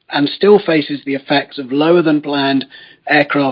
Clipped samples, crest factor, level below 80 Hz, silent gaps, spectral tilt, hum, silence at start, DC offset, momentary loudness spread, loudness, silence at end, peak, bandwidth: under 0.1%; 14 dB; -64 dBFS; none; -9 dB/octave; none; 0.1 s; under 0.1%; 9 LU; -14 LUFS; 0 s; 0 dBFS; 5.4 kHz